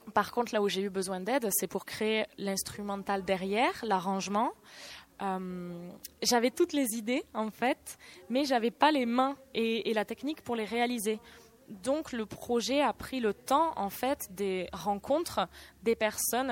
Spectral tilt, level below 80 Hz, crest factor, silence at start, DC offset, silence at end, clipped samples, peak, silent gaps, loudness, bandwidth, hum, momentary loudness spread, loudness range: -3.5 dB/octave; -64 dBFS; 22 dB; 0.05 s; under 0.1%; 0 s; under 0.1%; -10 dBFS; none; -31 LUFS; 16.5 kHz; none; 10 LU; 3 LU